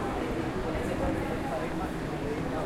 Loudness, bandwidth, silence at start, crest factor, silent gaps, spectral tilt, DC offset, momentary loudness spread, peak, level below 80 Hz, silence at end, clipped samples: -32 LUFS; 16.5 kHz; 0 s; 14 dB; none; -6.5 dB/octave; under 0.1%; 3 LU; -18 dBFS; -42 dBFS; 0 s; under 0.1%